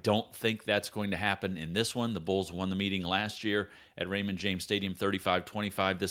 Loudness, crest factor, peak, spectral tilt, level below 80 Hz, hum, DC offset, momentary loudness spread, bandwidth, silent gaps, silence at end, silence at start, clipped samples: -32 LUFS; 22 dB; -12 dBFS; -4.5 dB/octave; -66 dBFS; none; under 0.1%; 4 LU; 16.5 kHz; none; 0 s; 0.05 s; under 0.1%